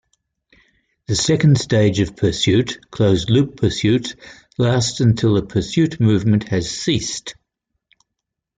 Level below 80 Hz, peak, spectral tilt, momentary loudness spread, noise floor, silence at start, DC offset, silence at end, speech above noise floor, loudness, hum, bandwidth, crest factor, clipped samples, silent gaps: -44 dBFS; -4 dBFS; -5.5 dB/octave; 9 LU; -80 dBFS; 1.1 s; under 0.1%; 1.25 s; 64 dB; -18 LUFS; none; 9.4 kHz; 16 dB; under 0.1%; none